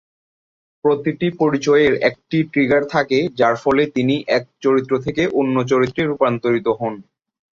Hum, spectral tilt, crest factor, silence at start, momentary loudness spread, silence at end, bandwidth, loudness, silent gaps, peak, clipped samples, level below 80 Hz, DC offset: none; -6.5 dB/octave; 16 dB; 0.85 s; 6 LU; 0.5 s; 7.4 kHz; -18 LUFS; none; -2 dBFS; under 0.1%; -54 dBFS; under 0.1%